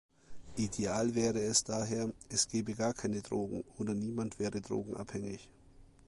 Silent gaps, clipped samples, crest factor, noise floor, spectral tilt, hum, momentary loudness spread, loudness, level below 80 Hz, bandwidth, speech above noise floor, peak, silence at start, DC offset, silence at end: none; under 0.1%; 22 dB; -59 dBFS; -4 dB/octave; none; 11 LU; -35 LUFS; -60 dBFS; 11.5 kHz; 24 dB; -14 dBFS; 0.3 s; under 0.1%; 0.2 s